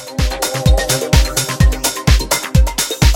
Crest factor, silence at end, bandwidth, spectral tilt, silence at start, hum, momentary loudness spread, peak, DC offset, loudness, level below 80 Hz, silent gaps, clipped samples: 14 dB; 0 s; 17 kHz; -4 dB/octave; 0 s; none; 3 LU; 0 dBFS; under 0.1%; -15 LUFS; -16 dBFS; none; under 0.1%